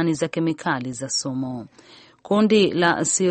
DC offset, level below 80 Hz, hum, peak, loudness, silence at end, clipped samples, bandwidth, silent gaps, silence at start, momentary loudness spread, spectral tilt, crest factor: under 0.1%; -62 dBFS; none; -4 dBFS; -21 LUFS; 0 s; under 0.1%; 8.8 kHz; none; 0 s; 11 LU; -4 dB/octave; 18 dB